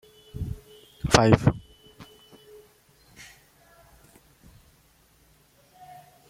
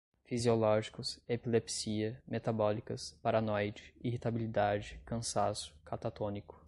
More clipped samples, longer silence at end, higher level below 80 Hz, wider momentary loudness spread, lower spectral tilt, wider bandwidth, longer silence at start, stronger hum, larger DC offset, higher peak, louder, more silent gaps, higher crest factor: neither; first, 4.25 s vs 0.1 s; first, -46 dBFS vs -60 dBFS; first, 30 LU vs 10 LU; about the same, -5.5 dB/octave vs -5 dB/octave; first, 16 kHz vs 11.5 kHz; about the same, 0.35 s vs 0.3 s; neither; neither; first, 0 dBFS vs -16 dBFS; first, -23 LUFS vs -36 LUFS; neither; first, 30 dB vs 18 dB